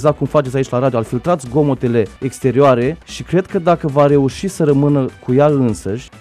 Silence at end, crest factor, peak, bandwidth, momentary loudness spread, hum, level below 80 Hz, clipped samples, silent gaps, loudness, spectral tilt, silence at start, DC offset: 0.05 s; 14 dB; -2 dBFS; 13 kHz; 7 LU; none; -42 dBFS; under 0.1%; none; -15 LUFS; -7.5 dB/octave; 0 s; under 0.1%